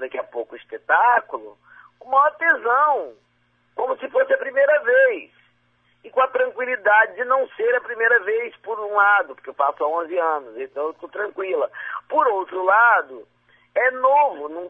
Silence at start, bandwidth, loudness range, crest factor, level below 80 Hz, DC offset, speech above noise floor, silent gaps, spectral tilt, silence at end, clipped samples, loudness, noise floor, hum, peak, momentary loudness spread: 0 s; 3.8 kHz; 3 LU; 18 dB; -74 dBFS; under 0.1%; 43 dB; none; -4.5 dB/octave; 0 s; under 0.1%; -20 LUFS; -63 dBFS; none; -4 dBFS; 14 LU